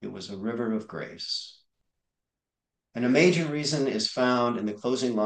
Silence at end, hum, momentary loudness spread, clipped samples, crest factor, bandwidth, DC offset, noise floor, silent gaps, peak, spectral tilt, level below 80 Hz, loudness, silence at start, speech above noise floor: 0 s; none; 15 LU; under 0.1%; 20 dB; 9.8 kHz; under 0.1%; -88 dBFS; none; -8 dBFS; -5 dB/octave; -74 dBFS; -27 LUFS; 0 s; 62 dB